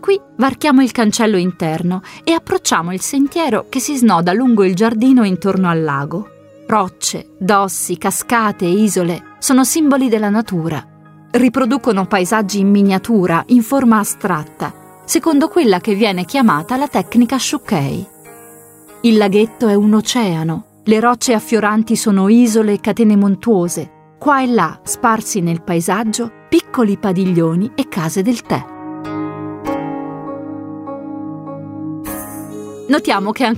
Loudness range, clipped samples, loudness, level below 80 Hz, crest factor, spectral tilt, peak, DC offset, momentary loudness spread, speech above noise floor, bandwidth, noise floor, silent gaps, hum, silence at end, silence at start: 7 LU; under 0.1%; -15 LUFS; -52 dBFS; 14 dB; -5 dB/octave; 0 dBFS; under 0.1%; 14 LU; 26 dB; 16 kHz; -40 dBFS; none; none; 0 s; 0 s